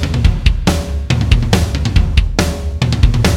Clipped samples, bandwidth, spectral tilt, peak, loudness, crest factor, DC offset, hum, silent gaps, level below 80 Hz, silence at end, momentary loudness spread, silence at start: under 0.1%; 16 kHz; -5.5 dB/octave; 0 dBFS; -15 LUFS; 12 dB; under 0.1%; none; none; -16 dBFS; 0 s; 5 LU; 0 s